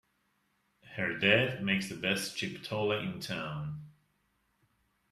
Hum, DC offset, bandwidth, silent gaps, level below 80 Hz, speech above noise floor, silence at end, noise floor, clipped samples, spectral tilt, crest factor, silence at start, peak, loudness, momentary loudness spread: none; under 0.1%; 14.5 kHz; none; -68 dBFS; 43 dB; 1.2 s; -76 dBFS; under 0.1%; -4.5 dB/octave; 24 dB; 0.85 s; -10 dBFS; -32 LUFS; 14 LU